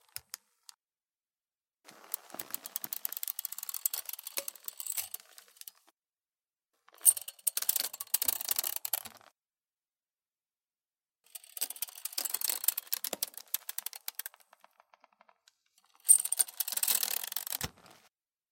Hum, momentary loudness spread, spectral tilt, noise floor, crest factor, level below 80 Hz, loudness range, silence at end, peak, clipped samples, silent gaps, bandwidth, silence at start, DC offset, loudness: none; 20 LU; 1.5 dB/octave; under -90 dBFS; 30 dB; -74 dBFS; 11 LU; 0.8 s; -8 dBFS; under 0.1%; none; 17 kHz; 0.15 s; under 0.1%; -31 LUFS